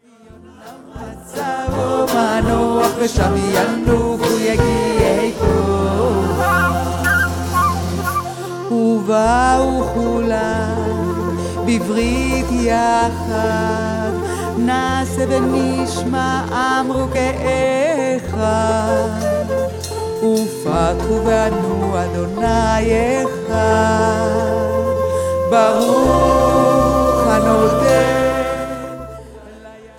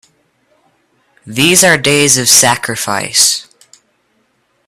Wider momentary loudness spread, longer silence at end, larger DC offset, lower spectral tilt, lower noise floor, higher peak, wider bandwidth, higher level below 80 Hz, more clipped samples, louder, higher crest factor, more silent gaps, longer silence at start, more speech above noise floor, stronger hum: second, 7 LU vs 10 LU; second, 0.1 s vs 1.25 s; neither; first, -5.5 dB/octave vs -1.5 dB/octave; second, -42 dBFS vs -59 dBFS; about the same, -2 dBFS vs 0 dBFS; second, 18 kHz vs over 20 kHz; first, -30 dBFS vs -50 dBFS; second, under 0.1% vs 0.3%; second, -16 LUFS vs -9 LUFS; about the same, 16 dB vs 14 dB; neither; second, 0.45 s vs 1.25 s; second, 27 dB vs 49 dB; neither